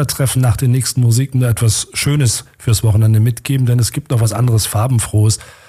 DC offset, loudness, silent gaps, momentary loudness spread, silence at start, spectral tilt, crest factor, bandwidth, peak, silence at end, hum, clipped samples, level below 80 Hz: under 0.1%; -14 LUFS; none; 4 LU; 0 s; -5 dB/octave; 10 dB; 16 kHz; -4 dBFS; 0.25 s; none; under 0.1%; -38 dBFS